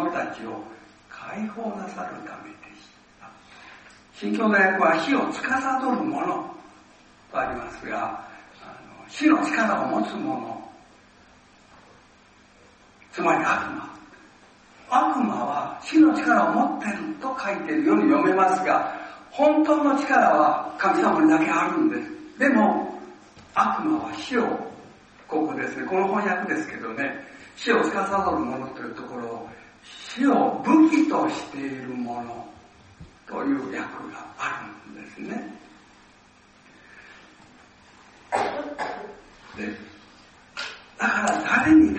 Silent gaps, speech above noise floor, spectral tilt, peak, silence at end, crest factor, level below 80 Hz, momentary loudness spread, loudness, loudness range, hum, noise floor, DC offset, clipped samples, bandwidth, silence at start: none; 32 dB; -5.5 dB/octave; -6 dBFS; 0 s; 18 dB; -60 dBFS; 20 LU; -23 LUFS; 14 LU; none; -54 dBFS; under 0.1%; under 0.1%; 8.4 kHz; 0 s